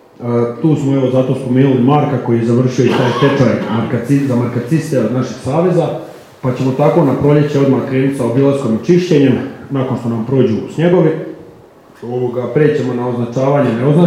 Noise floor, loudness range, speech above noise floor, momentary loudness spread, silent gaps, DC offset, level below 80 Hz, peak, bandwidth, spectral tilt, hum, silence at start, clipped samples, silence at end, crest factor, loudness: -41 dBFS; 3 LU; 28 dB; 8 LU; none; under 0.1%; -52 dBFS; 0 dBFS; 12.5 kHz; -8 dB/octave; none; 0.2 s; under 0.1%; 0 s; 12 dB; -14 LUFS